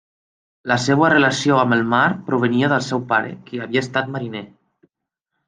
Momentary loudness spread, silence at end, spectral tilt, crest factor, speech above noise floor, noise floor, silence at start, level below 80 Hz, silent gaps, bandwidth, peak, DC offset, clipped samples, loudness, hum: 14 LU; 1 s; -5.5 dB/octave; 18 dB; 61 dB; -79 dBFS; 0.65 s; -60 dBFS; none; 9.8 kHz; -2 dBFS; under 0.1%; under 0.1%; -18 LUFS; none